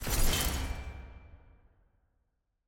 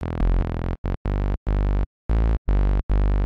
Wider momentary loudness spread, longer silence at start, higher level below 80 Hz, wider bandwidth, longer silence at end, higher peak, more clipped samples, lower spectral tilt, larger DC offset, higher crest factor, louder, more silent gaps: first, 22 LU vs 5 LU; about the same, 0 s vs 0 s; second, -36 dBFS vs -22 dBFS; first, 17 kHz vs 4.4 kHz; first, 1.3 s vs 0 s; about the same, -14 dBFS vs -12 dBFS; neither; second, -3 dB/octave vs -9.5 dB/octave; neither; first, 20 dB vs 8 dB; second, -33 LUFS vs -25 LUFS; second, none vs 0.78-0.84 s, 0.97-1.05 s, 1.37-1.46 s, 1.86-2.09 s, 2.38-2.45 s, 2.83-2.89 s